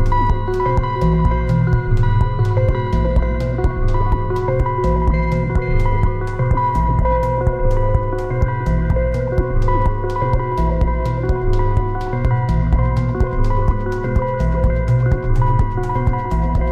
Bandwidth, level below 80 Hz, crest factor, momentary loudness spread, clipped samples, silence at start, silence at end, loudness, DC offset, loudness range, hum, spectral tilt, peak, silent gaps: 7.4 kHz; -20 dBFS; 12 dB; 3 LU; under 0.1%; 0 s; 0 s; -18 LUFS; under 0.1%; 1 LU; none; -9 dB/octave; -2 dBFS; none